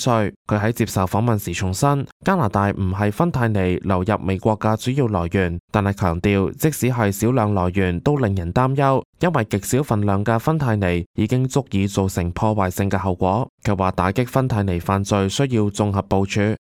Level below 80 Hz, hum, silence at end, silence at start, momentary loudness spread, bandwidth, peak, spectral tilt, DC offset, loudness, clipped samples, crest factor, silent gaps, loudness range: -42 dBFS; none; 0.1 s; 0 s; 3 LU; 16 kHz; -2 dBFS; -6.5 dB/octave; under 0.1%; -20 LUFS; under 0.1%; 16 dB; 0.36-0.45 s, 2.12-2.20 s, 5.60-5.68 s, 9.05-9.13 s, 11.06-11.14 s, 13.49-13.58 s; 1 LU